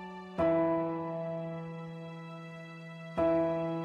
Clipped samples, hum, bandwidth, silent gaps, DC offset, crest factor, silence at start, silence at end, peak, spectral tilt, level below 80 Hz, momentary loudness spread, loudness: under 0.1%; none; 7.6 kHz; none; under 0.1%; 16 dB; 0 s; 0 s; -18 dBFS; -9 dB/octave; -62 dBFS; 17 LU; -33 LUFS